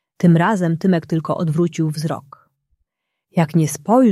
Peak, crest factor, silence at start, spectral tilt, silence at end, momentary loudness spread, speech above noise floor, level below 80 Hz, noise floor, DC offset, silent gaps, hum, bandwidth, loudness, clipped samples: -2 dBFS; 16 dB; 0.2 s; -7 dB/octave; 0 s; 10 LU; 58 dB; -60 dBFS; -75 dBFS; under 0.1%; none; none; 13 kHz; -18 LUFS; under 0.1%